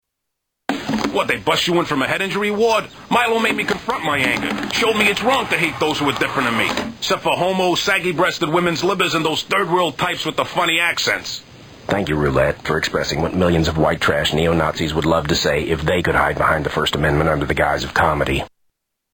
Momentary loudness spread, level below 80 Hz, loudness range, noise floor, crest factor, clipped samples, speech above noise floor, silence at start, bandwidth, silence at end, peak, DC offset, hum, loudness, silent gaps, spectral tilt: 5 LU; -38 dBFS; 2 LU; -78 dBFS; 16 dB; under 0.1%; 60 dB; 0.7 s; 19.5 kHz; 0.65 s; -2 dBFS; under 0.1%; none; -18 LUFS; none; -4.5 dB/octave